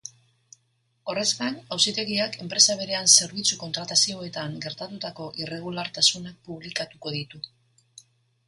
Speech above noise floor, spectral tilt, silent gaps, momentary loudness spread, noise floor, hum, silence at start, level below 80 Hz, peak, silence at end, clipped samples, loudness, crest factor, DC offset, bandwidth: 44 dB; -1 dB/octave; none; 19 LU; -70 dBFS; none; 0.05 s; -68 dBFS; -2 dBFS; 1 s; under 0.1%; -23 LUFS; 26 dB; under 0.1%; 11.5 kHz